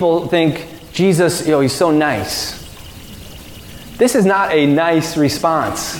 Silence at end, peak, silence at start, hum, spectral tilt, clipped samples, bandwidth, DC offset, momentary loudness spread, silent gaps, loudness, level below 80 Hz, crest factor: 0 s; -2 dBFS; 0 s; none; -5 dB/octave; under 0.1%; 18 kHz; under 0.1%; 21 LU; none; -15 LUFS; -44 dBFS; 14 dB